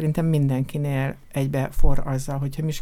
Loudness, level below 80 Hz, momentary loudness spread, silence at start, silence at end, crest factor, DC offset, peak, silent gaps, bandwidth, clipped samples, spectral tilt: -25 LUFS; -28 dBFS; 6 LU; 0 s; 0 s; 16 dB; under 0.1%; -4 dBFS; none; 14 kHz; under 0.1%; -7.5 dB/octave